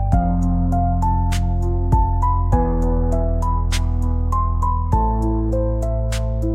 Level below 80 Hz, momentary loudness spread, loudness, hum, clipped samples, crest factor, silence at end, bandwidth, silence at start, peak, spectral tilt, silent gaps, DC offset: -20 dBFS; 3 LU; -20 LUFS; none; under 0.1%; 14 dB; 0 s; 11 kHz; 0 s; -4 dBFS; -7.5 dB/octave; none; 0.2%